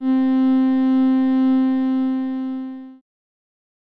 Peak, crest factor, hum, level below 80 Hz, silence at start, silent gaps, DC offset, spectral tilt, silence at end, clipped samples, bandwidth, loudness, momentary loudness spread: -10 dBFS; 8 dB; none; -74 dBFS; 0 s; none; under 0.1%; -7.5 dB/octave; 1.05 s; under 0.1%; 4.4 kHz; -18 LUFS; 11 LU